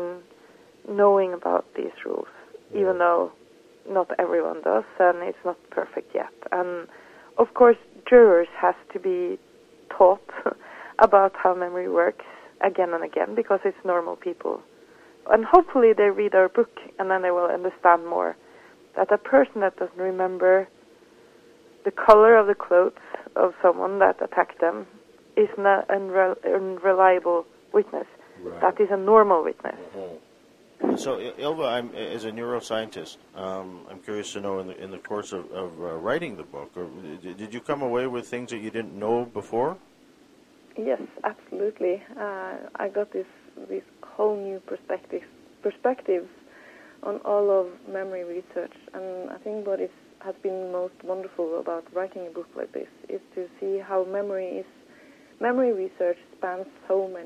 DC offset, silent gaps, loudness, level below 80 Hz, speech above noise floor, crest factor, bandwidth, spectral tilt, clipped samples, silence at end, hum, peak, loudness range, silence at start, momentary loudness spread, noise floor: under 0.1%; none; -23 LUFS; -64 dBFS; 32 dB; 24 dB; 10.5 kHz; -5.5 dB/octave; under 0.1%; 0 s; none; 0 dBFS; 12 LU; 0 s; 19 LU; -55 dBFS